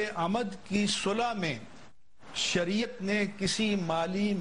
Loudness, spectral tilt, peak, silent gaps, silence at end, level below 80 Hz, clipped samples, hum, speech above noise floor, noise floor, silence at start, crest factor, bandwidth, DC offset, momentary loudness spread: -30 LUFS; -4 dB/octave; -14 dBFS; none; 0 s; -60 dBFS; under 0.1%; none; 27 dB; -57 dBFS; 0 s; 16 dB; 10.5 kHz; 0.4%; 5 LU